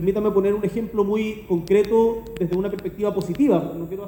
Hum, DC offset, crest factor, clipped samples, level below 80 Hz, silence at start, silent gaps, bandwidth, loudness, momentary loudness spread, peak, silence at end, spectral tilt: none; under 0.1%; 16 dB; under 0.1%; -46 dBFS; 0 s; none; 17 kHz; -22 LUFS; 7 LU; -6 dBFS; 0 s; -8 dB/octave